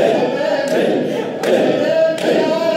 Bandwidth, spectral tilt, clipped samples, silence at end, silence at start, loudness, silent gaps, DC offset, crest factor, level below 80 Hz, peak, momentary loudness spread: 16 kHz; -5 dB/octave; under 0.1%; 0 s; 0 s; -16 LUFS; none; under 0.1%; 14 dB; -68 dBFS; -2 dBFS; 4 LU